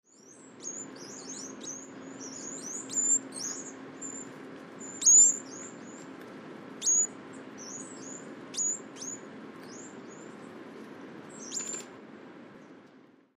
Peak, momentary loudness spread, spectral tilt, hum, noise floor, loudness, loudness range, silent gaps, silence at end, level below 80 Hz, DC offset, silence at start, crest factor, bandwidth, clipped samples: -12 dBFS; 22 LU; -0.5 dB/octave; none; -58 dBFS; -26 LUFS; 17 LU; none; 0.3 s; -84 dBFS; under 0.1%; 0.2 s; 22 dB; 15 kHz; under 0.1%